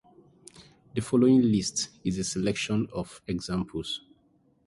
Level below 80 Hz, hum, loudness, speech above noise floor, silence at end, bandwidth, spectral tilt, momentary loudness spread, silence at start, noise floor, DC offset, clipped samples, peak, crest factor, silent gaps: -54 dBFS; none; -28 LUFS; 39 dB; 0.7 s; 11.5 kHz; -5 dB/octave; 14 LU; 0.6 s; -65 dBFS; under 0.1%; under 0.1%; -10 dBFS; 18 dB; none